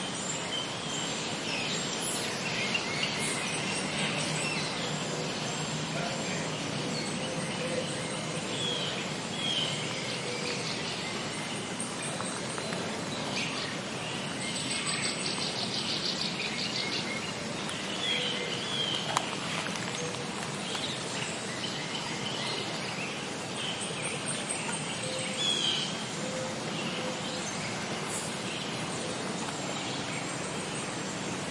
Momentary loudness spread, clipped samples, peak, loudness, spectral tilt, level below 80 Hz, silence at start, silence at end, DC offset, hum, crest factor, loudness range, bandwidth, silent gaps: 5 LU; under 0.1%; -8 dBFS; -32 LUFS; -2.5 dB/octave; -66 dBFS; 0 s; 0 s; under 0.1%; none; 26 dB; 3 LU; 11.5 kHz; none